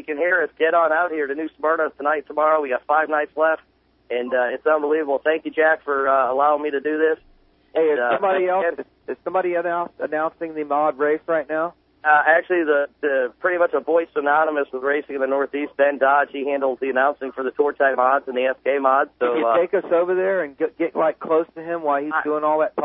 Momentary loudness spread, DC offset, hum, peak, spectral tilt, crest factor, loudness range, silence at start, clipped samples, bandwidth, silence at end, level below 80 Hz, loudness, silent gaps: 7 LU; under 0.1%; none; -4 dBFS; -9 dB/octave; 18 dB; 2 LU; 0.1 s; under 0.1%; 3.9 kHz; 0 s; -66 dBFS; -21 LUFS; none